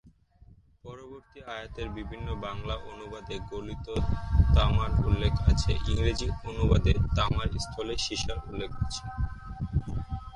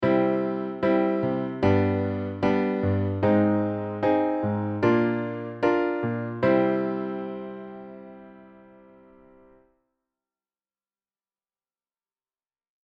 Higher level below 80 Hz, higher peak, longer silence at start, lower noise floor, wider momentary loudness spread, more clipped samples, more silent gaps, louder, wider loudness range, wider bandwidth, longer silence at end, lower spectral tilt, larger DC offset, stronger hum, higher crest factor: first, -32 dBFS vs -60 dBFS; about the same, -8 dBFS vs -8 dBFS; about the same, 0.05 s vs 0 s; second, -57 dBFS vs under -90 dBFS; first, 16 LU vs 13 LU; neither; neither; second, -30 LUFS vs -25 LUFS; about the same, 12 LU vs 11 LU; first, 11 kHz vs 6.2 kHz; second, 0 s vs 4.35 s; second, -6 dB/octave vs -9.5 dB/octave; neither; neither; about the same, 20 dB vs 18 dB